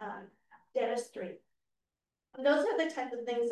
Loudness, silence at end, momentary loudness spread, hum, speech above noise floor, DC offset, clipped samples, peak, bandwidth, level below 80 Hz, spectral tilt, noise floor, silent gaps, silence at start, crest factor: -34 LUFS; 0 s; 18 LU; none; over 57 dB; under 0.1%; under 0.1%; -16 dBFS; 12.5 kHz; -86 dBFS; -4 dB/octave; under -90 dBFS; none; 0 s; 20 dB